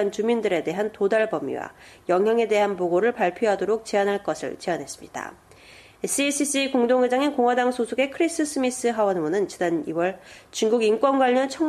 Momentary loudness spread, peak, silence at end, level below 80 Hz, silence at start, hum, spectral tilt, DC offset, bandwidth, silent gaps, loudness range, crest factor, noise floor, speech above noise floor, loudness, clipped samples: 12 LU; -8 dBFS; 0 s; -64 dBFS; 0 s; none; -4 dB/octave; under 0.1%; 13.5 kHz; none; 3 LU; 14 dB; -49 dBFS; 26 dB; -23 LUFS; under 0.1%